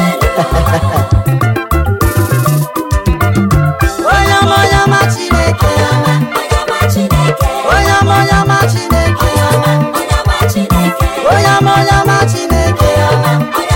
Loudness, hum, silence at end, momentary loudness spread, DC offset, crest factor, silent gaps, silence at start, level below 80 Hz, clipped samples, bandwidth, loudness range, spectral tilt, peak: -10 LUFS; none; 0 s; 5 LU; under 0.1%; 10 dB; none; 0 s; -20 dBFS; under 0.1%; 17 kHz; 2 LU; -5.5 dB/octave; 0 dBFS